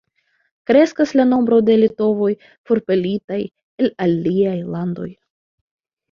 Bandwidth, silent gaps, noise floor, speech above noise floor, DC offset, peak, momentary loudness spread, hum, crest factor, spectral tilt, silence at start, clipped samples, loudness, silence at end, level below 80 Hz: 7.2 kHz; 2.58-2.64 s, 3.24-3.28 s, 3.63-3.78 s; -66 dBFS; 49 dB; under 0.1%; -2 dBFS; 13 LU; none; 18 dB; -7.5 dB/octave; 0.7 s; under 0.1%; -17 LUFS; 1 s; -60 dBFS